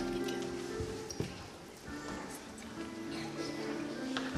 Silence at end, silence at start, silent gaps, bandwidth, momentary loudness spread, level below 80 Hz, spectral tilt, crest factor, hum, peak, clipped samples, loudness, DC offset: 0 s; 0 s; none; 15 kHz; 8 LU; -58 dBFS; -4.5 dB/octave; 22 dB; none; -18 dBFS; under 0.1%; -41 LUFS; under 0.1%